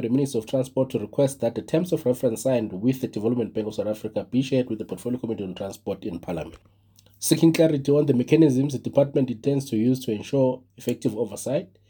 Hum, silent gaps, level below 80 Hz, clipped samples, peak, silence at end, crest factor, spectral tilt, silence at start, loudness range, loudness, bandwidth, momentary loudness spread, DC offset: none; none; -62 dBFS; under 0.1%; -4 dBFS; 0.25 s; 20 dB; -6.5 dB/octave; 0 s; 7 LU; -24 LUFS; over 20 kHz; 12 LU; under 0.1%